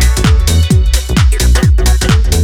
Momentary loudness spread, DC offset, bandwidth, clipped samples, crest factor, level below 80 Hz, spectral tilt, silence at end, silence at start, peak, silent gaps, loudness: 1 LU; under 0.1%; 16.5 kHz; under 0.1%; 8 dB; -10 dBFS; -5 dB/octave; 0 s; 0 s; 0 dBFS; none; -11 LUFS